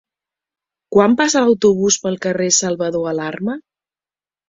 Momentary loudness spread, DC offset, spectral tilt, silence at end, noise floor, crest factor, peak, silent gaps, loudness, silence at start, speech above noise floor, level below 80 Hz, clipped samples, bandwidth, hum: 10 LU; under 0.1%; -3.5 dB/octave; 0.9 s; under -90 dBFS; 16 dB; -2 dBFS; none; -16 LUFS; 0.9 s; over 74 dB; -58 dBFS; under 0.1%; 7.8 kHz; none